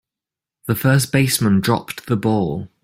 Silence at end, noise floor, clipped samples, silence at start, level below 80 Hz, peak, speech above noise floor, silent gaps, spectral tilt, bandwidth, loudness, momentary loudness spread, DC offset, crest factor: 0.15 s; -88 dBFS; under 0.1%; 0.65 s; -50 dBFS; -2 dBFS; 70 dB; none; -5.5 dB/octave; 16.5 kHz; -18 LUFS; 8 LU; under 0.1%; 16 dB